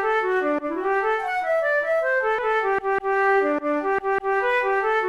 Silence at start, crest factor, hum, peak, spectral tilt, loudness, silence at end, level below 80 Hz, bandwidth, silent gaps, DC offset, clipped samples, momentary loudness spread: 0 s; 12 dB; none; -10 dBFS; -4.5 dB/octave; -22 LUFS; 0 s; -56 dBFS; 11.5 kHz; none; 0.1%; under 0.1%; 3 LU